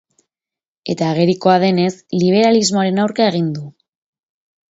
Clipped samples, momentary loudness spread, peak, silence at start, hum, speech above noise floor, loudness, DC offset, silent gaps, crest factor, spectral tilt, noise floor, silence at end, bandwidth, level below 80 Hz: under 0.1%; 12 LU; 0 dBFS; 0.85 s; none; 75 dB; -15 LUFS; under 0.1%; none; 16 dB; -5.5 dB/octave; -90 dBFS; 1 s; 8 kHz; -62 dBFS